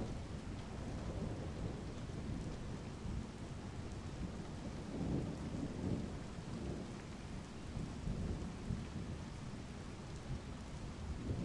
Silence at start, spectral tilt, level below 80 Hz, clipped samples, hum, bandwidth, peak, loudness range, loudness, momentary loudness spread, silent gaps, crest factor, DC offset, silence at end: 0 s; -6.5 dB/octave; -52 dBFS; under 0.1%; none; 11.5 kHz; -26 dBFS; 2 LU; -46 LUFS; 7 LU; none; 18 dB; under 0.1%; 0 s